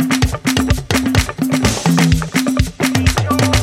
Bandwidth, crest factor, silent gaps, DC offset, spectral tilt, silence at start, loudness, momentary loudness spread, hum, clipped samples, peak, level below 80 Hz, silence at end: 16.5 kHz; 14 dB; none; under 0.1%; -5 dB/octave; 0 s; -15 LUFS; 3 LU; none; under 0.1%; 0 dBFS; -24 dBFS; 0 s